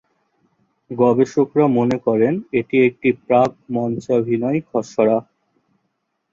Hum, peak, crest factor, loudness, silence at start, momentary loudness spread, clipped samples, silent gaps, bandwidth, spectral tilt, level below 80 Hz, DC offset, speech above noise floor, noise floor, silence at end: none; -2 dBFS; 16 dB; -18 LUFS; 0.9 s; 7 LU; under 0.1%; none; 7.6 kHz; -8 dB/octave; -60 dBFS; under 0.1%; 55 dB; -72 dBFS; 1.1 s